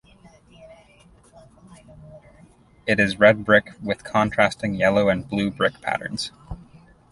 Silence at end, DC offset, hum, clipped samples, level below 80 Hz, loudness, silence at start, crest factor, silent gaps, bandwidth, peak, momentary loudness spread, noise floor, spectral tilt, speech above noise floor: 0.55 s; under 0.1%; none; under 0.1%; -50 dBFS; -21 LUFS; 0.6 s; 22 dB; none; 11.5 kHz; -2 dBFS; 16 LU; -53 dBFS; -5.5 dB/octave; 32 dB